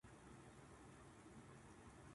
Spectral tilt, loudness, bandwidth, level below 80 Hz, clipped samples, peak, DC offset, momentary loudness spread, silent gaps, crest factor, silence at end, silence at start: -5 dB/octave; -63 LUFS; 11.5 kHz; -72 dBFS; under 0.1%; -48 dBFS; under 0.1%; 1 LU; none; 14 dB; 0 s; 0.05 s